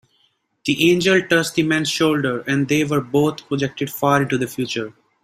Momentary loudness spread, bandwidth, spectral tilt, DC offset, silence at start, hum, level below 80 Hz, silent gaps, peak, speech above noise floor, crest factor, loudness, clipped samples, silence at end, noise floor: 9 LU; 16 kHz; -5 dB/octave; under 0.1%; 0.65 s; none; -56 dBFS; none; -2 dBFS; 45 dB; 18 dB; -19 LUFS; under 0.1%; 0.3 s; -64 dBFS